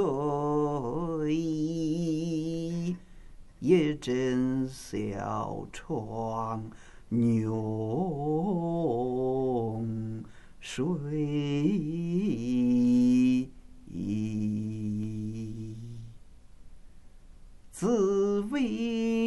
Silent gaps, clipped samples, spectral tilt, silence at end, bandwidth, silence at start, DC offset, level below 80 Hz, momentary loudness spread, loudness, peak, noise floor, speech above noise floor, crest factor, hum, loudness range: none; under 0.1%; -7.5 dB/octave; 0 s; 12 kHz; 0 s; under 0.1%; -54 dBFS; 14 LU; -30 LUFS; -10 dBFS; -49 dBFS; 21 dB; 18 dB; none; 8 LU